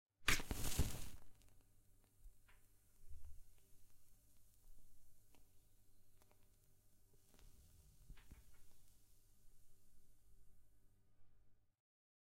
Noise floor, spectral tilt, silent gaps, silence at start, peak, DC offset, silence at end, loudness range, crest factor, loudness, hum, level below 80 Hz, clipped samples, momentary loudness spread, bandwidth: -70 dBFS; -2.5 dB/octave; none; 0.2 s; -20 dBFS; under 0.1%; 0.65 s; 19 LU; 30 dB; -43 LUFS; none; -56 dBFS; under 0.1%; 25 LU; 16 kHz